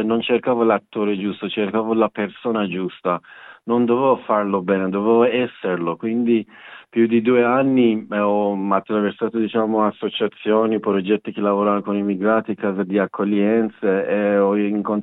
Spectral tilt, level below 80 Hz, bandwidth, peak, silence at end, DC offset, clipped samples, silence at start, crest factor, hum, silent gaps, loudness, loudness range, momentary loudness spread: -10.5 dB/octave; -74 dBFS; 4 kHz; -4 dBFS; 0 s; under 0.1%; under 0.1%; 0 s; 16 dB; none; none; -20 LUFS; 2 LU; 7 LU